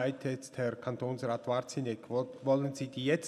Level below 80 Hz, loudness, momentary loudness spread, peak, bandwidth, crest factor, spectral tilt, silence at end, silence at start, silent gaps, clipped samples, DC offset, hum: -80 dBFS; -35 LUFS; 6 LU; -16 dBFS; 13 kHz; 18 dB; -6 dB/octave; 0 s; 0 s; none; under 0.1%; under 0.1%; none